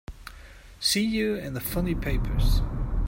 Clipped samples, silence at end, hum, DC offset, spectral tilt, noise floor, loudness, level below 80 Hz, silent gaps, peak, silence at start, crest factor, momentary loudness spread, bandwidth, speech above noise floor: under 0.1%; 0 s; none; under 0.1%; -4.5 dB/octave; -47 dBFS; -27 LUFS; -30 dBFS; none; -12 dBFS; 0.1 s; 16 dB; 15 LU; 16.5 kHz; 22 dB